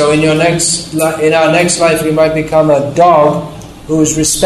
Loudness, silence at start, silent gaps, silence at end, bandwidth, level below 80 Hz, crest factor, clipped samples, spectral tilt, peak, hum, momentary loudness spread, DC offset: -10 LUFS; 0 s; none; 0 s; 13 kHz; -38 dBFS; 10 dB; under 0.1%; -4 dB/octave; 0 dBFS; none; 6 LU; under 0.1%